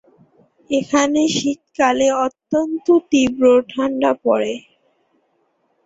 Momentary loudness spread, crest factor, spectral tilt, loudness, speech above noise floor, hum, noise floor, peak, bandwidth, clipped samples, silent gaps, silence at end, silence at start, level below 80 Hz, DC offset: 8 LU; 16 dB; -4 dB/octave; -17 LUFS; 48 dB; none; -65 dBFS; -2 dBFS; 8 kHz; under 0.1%; none; 1.25 s; 0.7 s; -56 dBFS; under 0.1%